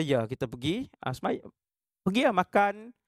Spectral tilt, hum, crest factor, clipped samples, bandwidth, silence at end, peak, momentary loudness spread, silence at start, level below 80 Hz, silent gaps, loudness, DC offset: -6 dB/octave; none; 20 dB; under 0.1%; 14.5 kHz; 0.15 s; -10 dBFS; 10 LU; 0 s; -62 dBFS; none; -29 LUFS; under 0.1%